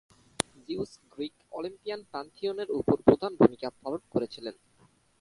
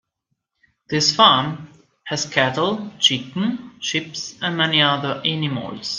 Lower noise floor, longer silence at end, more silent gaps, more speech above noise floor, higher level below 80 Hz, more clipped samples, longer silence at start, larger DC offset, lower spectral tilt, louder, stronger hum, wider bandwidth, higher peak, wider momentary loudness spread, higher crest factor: second, -64 dBFS vs -76 dBFS; first, 0.7 s vs 0 s; neither; second, 35 dB vs 55 dB; about the same, -60 dBFS vs -62 dBFS; neither; second, 0.7 s vs 0.9 s; neither; first, -5.5 dB/octave vs -3.5 dB/octave; second, -30 LUFS vs -19 LUFS; neither; first, 11.5 kHz vs 10 kHz; second, -4 dBFS vs 0 dBFS; about the same, 16 LU vs 14 LU; about the same, 26 dB vs 22 dB